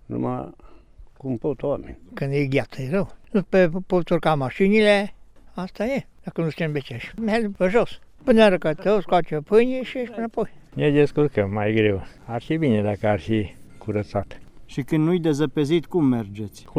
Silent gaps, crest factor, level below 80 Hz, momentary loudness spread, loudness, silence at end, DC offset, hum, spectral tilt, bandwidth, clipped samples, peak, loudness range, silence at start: none; 18 dB; -46 dBFS; 14 LU; -22 LUFS; 0 s; under 0.1%; none; -7.5 dB/octave; 12.5 kHz; under 0.1%; -4 dBFS; 4 LU; 0.1 s